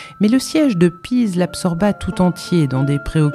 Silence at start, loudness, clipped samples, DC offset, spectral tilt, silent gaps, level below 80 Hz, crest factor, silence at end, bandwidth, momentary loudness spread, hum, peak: 0 s; -17 LUFS; under 0.1%; under 0.1%; -6.5 dB/octave; none; -38 dBFS; 14 dB; 0 s; 14 kHz; 4 LU; none; -2 dBFS